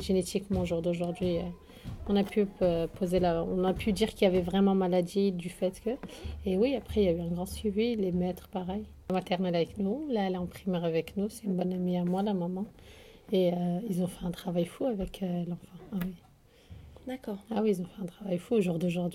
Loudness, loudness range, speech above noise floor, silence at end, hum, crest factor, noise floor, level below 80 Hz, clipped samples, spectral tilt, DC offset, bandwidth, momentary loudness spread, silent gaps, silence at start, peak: -31 LUFS; 7 LU; 24 dB; 0 s; none; 20 dB; -55 dBFS; -50 dBFS; under 0.1%; -7 dB/octave; under 0.1%; 15.5 kHz; 11 LU; none; 0 s; -12 dBFS